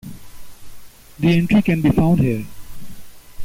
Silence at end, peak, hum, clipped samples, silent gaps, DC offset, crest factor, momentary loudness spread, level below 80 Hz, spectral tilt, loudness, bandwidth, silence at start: 0 s; -6 dBFS; none; under 0.1%; none; under 0.1%; 12 dB; 16 LU; -40 dBFS; -7.5 dB/octave; -17 LUFS; 16 kHz; 0.05 s